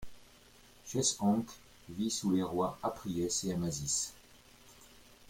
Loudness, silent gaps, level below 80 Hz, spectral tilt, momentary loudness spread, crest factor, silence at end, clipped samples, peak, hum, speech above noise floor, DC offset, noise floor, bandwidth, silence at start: -34 LUFS; none; -62 dBFS; -4 dB/octave; 12 LU; 20 dB; 0.05 s; under 0.1%; -16 dBFS; none; 26 dB; under 0.1%; -60 dBFS; 16.5 kHz; 0 s